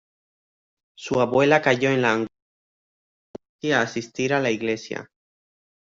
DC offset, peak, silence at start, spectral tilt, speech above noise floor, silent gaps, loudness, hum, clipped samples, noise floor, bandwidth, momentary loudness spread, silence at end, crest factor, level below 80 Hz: under 0.1%; -4 dBFS; 1 s; -5 dB/octave; over 68 dB; 2.42-3.34 s, 3.49-3.59 s; -22 LUFS; none; under 0.1%; under -90 dBFS; 7.8 kHz; 15 LU; 0.85 s; 22 dB; -64 dBFS